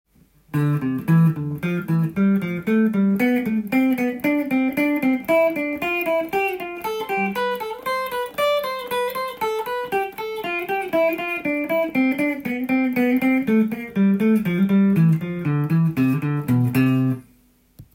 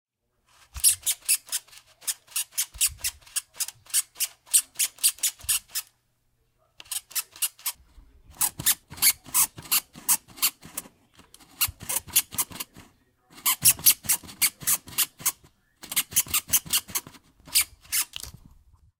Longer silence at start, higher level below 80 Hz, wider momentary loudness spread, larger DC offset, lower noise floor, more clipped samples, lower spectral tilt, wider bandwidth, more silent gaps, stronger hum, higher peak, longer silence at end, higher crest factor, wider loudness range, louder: second, 0.55 s vs 0.75 s; about the same, -58 dBFS vs -56 dBFS; second, 7 LU vs 12 LU; neither; second, -57 dBFS vs -70 dBFS; neither; first, -7.5 dB/octave vs 1.5 dB/octave; about the same, 17 kHz vs 18 kHz; neither; neither; second, -8 dBFS vs -2 dBFS; second, 0.1 s vs 0.7 s; second, 14 dB vs 26 dB; about the same, 5 LU vs 5 LU; first, -21 LUFS vs -24 LUFS